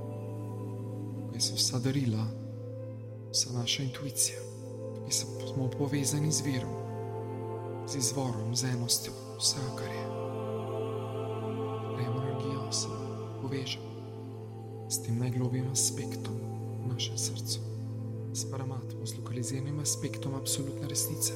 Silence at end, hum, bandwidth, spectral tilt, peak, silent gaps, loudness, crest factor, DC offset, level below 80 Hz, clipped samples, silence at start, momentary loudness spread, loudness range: 0 s; none; 16 kHz; -4 dB/octave; -14 dBFS; none; -33 LUFS; 20 dB; under 0.1%; -64 dBFS; under 0.1%; 0 s; 11 LU; 4 LU